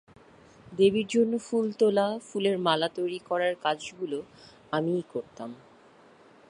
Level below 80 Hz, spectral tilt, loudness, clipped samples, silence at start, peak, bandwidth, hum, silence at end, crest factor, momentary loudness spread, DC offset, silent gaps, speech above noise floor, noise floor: -70 dBFS; -5.5 dB/octave; -28 LUFS; under 0.1%; 0.65 s; -8 dBFS; 11 kHz; none; 0.95 s; 20 dB; 14 LU; under 0.1%; none; 28 dB; -56 dBFS